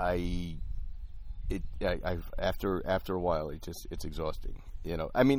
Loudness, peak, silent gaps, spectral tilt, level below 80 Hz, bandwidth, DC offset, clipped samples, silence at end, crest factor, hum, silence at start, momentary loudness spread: -35 LUFS; -12 dBFS; none; -6.5 dB/octave; -40 dBFS; 19.5 kHz; under 0.1%; under 0.1%; 0 s; 20 dB; none; 0 s; 14 LU